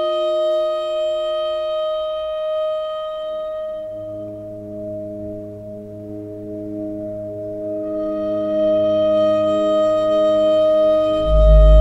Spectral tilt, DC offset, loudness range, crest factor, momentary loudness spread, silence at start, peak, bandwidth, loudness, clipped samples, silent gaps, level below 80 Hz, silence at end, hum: -8 dB/octave; under 0.1%; 13 LU; 16 dB; 16 LU; 0 s; -2 dBFS; 8 kHz; -19 LUFS; under 0.1%; none; -24 dBFS; 0 s; none